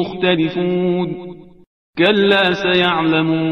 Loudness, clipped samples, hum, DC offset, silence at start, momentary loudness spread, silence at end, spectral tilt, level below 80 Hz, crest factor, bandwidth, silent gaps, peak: -15 LUFS; under 0.1%; none; 0.3%; 0 s; 13 LU; 0 s; -7 dB/octave; -54 dBFS; 16 dB; 6.6 kHz; 1.67-1.93 s; 0 dBFS